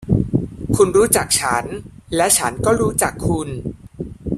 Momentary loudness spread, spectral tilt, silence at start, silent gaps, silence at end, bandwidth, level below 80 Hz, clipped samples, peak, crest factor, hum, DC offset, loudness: 16 LU; -4 dB/octave; 0 s; none; 0 s; 16 kHz; -38 dBFS; under 0.1%; 0 dBFS; 18 dB; none; under 0.1%; -17 LUFS